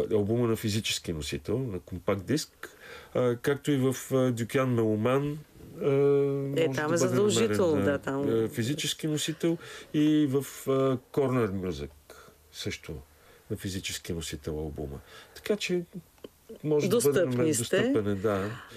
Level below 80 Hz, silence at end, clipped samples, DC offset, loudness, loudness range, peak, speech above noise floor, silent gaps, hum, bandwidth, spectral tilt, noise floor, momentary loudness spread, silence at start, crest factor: -56 dBFS; 0 s; under 0.1%; under 0.1%; -28 LUFS; 8 LU; -14 dBFS; 25 dB; none; none; 15.5 kHz; -5.5 dB/octave; -53 dBFS; 15 LU; 0 s; 14 dB